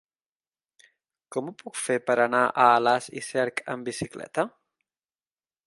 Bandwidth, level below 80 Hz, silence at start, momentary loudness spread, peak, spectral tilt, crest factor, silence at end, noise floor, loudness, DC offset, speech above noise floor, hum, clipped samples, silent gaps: 11.5 kHz; -68 dBFS; 1.3 s; 14 LU; -4 dBFS; -4 dB/octave; 24 dB; 1.2 s; under -90 dBFS; -25 LUFS; under 0.1%; over 65 dB; none; under 0.1%; none